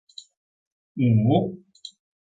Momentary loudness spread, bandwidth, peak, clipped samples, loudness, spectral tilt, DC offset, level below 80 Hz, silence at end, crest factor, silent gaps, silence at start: 24 LU; 7.8 kHz; -6 dBFS; under 0.1%; -22 LUFS; -8.5 dB/octave; under 0.1%; -60 dBFS; 0.35 s; 18 dB; none; 0.95 s